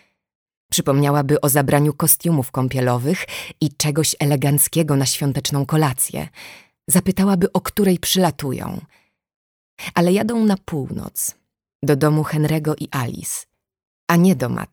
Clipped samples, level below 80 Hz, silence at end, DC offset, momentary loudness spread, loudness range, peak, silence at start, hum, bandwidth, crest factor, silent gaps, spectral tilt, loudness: under 0.1%; -50 dBFS; 0.05 s; under 0.1%; 11 LU; 4 LU; -2 dBFS; 0.7 s; none; over 20 kHz; 18 dB; 9.36-9.77 s, 11.75-11.80 s, 13.87-14.07 s; -5 dB/octave; -19 LUFS